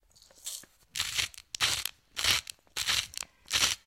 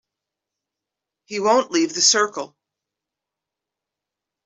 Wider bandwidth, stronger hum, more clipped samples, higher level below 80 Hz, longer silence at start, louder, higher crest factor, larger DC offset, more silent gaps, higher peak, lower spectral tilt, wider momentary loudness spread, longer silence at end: first, 17 kHz vs 8.2 kHz; neither; neither; first, -56 dBFS vs -76 dBFS; second, 0.45 s vs 1.3 s; second, -30 LUFS vs -18 LUFS; about the same, 26 dB vs 22 dB; neither; neither; second, -8 dBFS vs -2 dBFS; second, 1 dB/octave vs -1 dB/octave; second, 13 LU vs 17 LU; second, 0.1 s vs 2 s